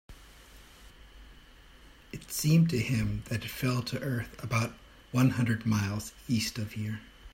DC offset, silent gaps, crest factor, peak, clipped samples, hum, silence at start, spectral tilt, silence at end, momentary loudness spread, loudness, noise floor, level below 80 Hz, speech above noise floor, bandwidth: under 0.1%; none; 18 dB; -14 dBFS; under 0.1%; none; 0.1 s; -5.5 dB/octave; 0.05 s; 12 LU; -30 LUFS; -54 dBFS; -52 dBFS; 25 dB; 16 kHz